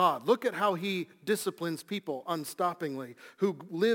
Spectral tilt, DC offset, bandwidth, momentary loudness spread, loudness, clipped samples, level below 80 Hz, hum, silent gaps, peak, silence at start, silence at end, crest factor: -5 dB/octave; under 0.1%; 17 kHz; 9 LU; -32 LUFS; under 0.1%; -82 dBFS; none; none; -12 dBFS; 0 s; 0 s; 18 dB